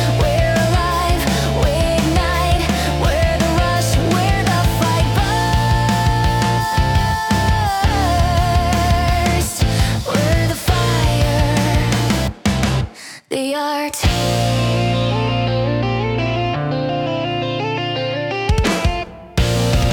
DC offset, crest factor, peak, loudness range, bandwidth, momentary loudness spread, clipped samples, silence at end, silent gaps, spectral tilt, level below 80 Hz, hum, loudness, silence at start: under 0.1%; 14 dB; -2 dBFS; 3 LU; 18 kHz; 5 LU; under 0.1%; 0 s; none; -5 dB/octave; -24 dBFS; none; -17 LUFS; 0 s